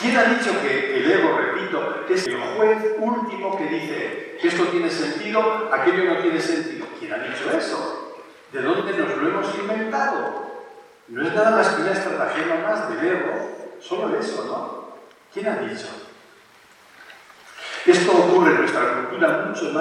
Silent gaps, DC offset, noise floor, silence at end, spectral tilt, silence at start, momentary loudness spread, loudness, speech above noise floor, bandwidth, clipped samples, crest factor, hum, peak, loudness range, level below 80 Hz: none; under 0.1%; -51 dBFS; 0 s; -4.5 dB/octave; 0 s; 16 LU; -21 LUFS; 30 dB; 11.5 kHz; under 0.1%; 20 dB; none; -2 dBFS; 8 LU; -78 dBFS